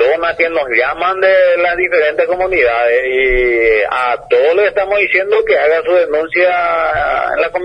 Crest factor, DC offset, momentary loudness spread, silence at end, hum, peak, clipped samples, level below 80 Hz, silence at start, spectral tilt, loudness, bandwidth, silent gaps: 12 dB; under 0.1%; 4 LU; 0 s; none; 0 dBFS; under 0.1%; -36 dBFS; 0 s; -5.5 dB/octave; -12 LUFS; 10 kHz; none